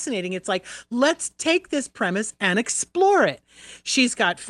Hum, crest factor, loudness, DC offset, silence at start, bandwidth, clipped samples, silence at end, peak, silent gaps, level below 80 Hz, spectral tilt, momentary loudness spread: none; 18 dB; -22 LUFS; under 0.1%; 0 s; 12 kHz; under 0.1%; 0 s; -6 dBFS; none; -66 dBFS; -3 dB/octave; 9 LU